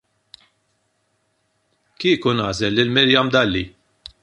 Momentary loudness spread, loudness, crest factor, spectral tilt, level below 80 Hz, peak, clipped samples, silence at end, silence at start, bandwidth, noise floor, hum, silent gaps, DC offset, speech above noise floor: 9 LU; -18 LUFS; 20 dB; -5 dB/octave; -48 dBFS; -2 dBFS; under 0.1%; 0.55 s; 2 s; 11 kHz; -68 dBFS; none; none; under 0.1%; 50 dB